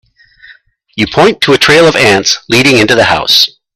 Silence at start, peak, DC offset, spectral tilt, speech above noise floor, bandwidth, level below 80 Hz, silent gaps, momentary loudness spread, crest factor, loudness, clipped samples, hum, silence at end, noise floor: 0.5 s; 0 dBFS; under 0.1%; -3.5 dB/octave; 34 dB; over 20 kHz; -42 dBFS; none; 5 LU; 10 dB; -7 LUFS; 0.6%; none; 0.25 s; -41 dBFS